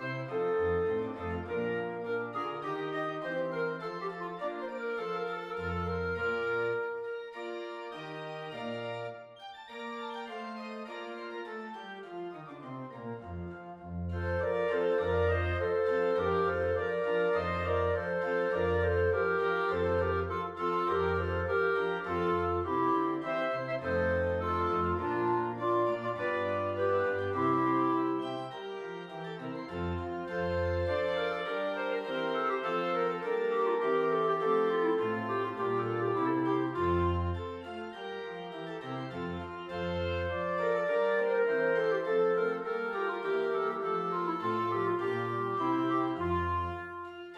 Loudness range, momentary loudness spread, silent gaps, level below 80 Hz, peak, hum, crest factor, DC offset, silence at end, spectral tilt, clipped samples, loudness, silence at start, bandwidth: 10 LU; 12 LU; none; -54 dBFS; -18 dBFS; none; 14 dB; under 0.1%; 0 s; -7.5 dB/octave; under 0.1%; -32 LUFS; 0 s; 8 kHz